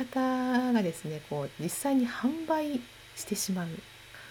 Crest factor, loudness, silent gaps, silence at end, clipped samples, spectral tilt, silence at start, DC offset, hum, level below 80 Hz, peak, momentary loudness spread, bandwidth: 16 dB; -31 LUFS; none; 0 s; under 0.1%; -4.5 dB/octave; 0 s; under 0.1%; none; -66 dBFS; -16 dBFS; 14 LU; 19 kHz